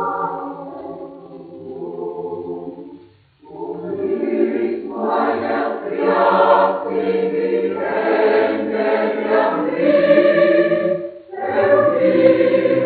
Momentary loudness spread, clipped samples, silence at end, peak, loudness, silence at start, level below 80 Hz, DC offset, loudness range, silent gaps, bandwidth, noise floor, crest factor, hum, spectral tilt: 18 LU; under 0.1%; 0 s; -2 dBFS; -17 LUFS; 0 s; -66 dBFS; under 0.1%; 13 LU; none; 4.7 kHz; -47 dBFS; 16 dB; none; -4.5 dB/octave